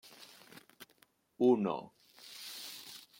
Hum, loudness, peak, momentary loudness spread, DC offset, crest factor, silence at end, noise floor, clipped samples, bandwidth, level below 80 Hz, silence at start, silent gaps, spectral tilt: none; -34 LUFS; -18 dBFS; 27 LU; under 0.1%; 20 dB; 0.2 s; -70 dBFS; under 0.1%; 16.5 kHz; -86 dBFS; 0.8 s; none; -5.5 dB/octave